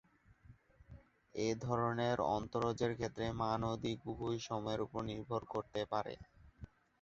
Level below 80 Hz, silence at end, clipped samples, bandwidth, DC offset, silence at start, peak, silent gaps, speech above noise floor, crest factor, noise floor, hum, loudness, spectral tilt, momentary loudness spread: -62 dBFS; 0.35 s; under 0.1%; 7.8 kHz; under 0.1%; 0.5 s; -20 dBFS; none; 25 dB; 20 dB; -64 dBFS; none; -39 LUFS; -5.5 dB/octave; 13 LU